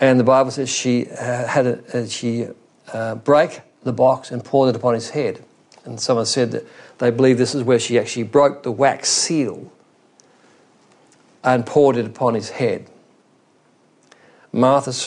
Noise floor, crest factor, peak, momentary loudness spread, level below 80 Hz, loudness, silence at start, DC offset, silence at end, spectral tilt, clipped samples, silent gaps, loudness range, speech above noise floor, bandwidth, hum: -57 dBFS; 16 dB; -4 dBFS; 11 LU; -66 dBFS; -19 LUFS; 0 s; under 0.1%; 0 s; -4.5 dB/octave; under 0.1%; none; 4 LU; 39 dB; 11 kHz; none